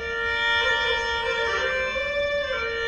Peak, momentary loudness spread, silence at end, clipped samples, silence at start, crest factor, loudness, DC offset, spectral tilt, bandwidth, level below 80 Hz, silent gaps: -10 dBFS; 4 LU; 0 s; under 0.1%; 0 s; 14 dB; -23 LUFS; 0.1%; -2 dB/octave; 10.5 kHz; -46 dBFS; none